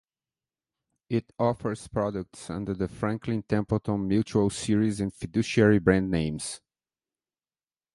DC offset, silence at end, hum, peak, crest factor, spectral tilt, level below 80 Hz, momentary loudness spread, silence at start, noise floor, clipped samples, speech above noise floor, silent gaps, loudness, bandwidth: under 0.1%; 1.4 s; none; -6 dBFS; 22 dB; -6.5 dB/octave; -50 dBFS; 11 LU; 1.1 s; under -90 dBFS; under 0.1%; over 64 dB; none; -27 LUFS; 11.5 kHz